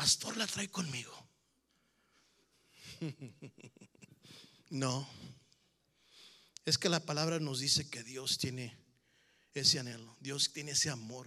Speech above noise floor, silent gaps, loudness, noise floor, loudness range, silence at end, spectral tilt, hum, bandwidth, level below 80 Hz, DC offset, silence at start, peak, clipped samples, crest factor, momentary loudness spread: 40 dB; none; -35 LUFS; -77 dBFS; 15 LU; 0 s; -2.5 dB/octave; none; 15 kHz; -76 dBFS; under 0.1%; 0 s; -14 dBFS; under 0.1%; 26 dB; 24 LU